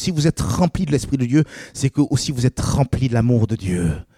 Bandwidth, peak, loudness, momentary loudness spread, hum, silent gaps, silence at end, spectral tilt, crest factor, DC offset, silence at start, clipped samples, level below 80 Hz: 15 kHz; -4 dBFS; -19 LUFS; 4 LU; none; none; 0.15 s; -6 dB/octave; 14 dB; under 0.1%; 0 s; under 0.1%; -36 dBFS